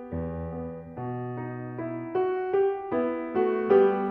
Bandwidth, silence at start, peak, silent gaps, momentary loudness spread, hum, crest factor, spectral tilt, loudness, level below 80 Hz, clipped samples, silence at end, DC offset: 3.5 kHz; 0 s; -8 dBFS; none; 14 LU; none; 18 dB; -10.5 dB/octave; -28 LUFS; -56 dBFS; under 0.1%; 0 s; under 0.1%